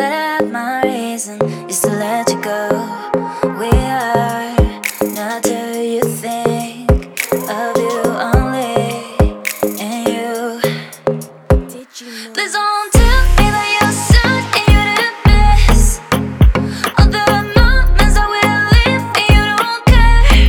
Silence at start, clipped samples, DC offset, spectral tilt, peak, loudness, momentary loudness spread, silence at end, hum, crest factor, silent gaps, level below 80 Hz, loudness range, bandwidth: 0 s; under 0.1%; under 0.1%; -5 dB/octave; 0 dBFS; -14 LUFS; 9 LU; 0 s; none; 12 dB; none; -16 dBFS; 6 LU; 18.5 kHz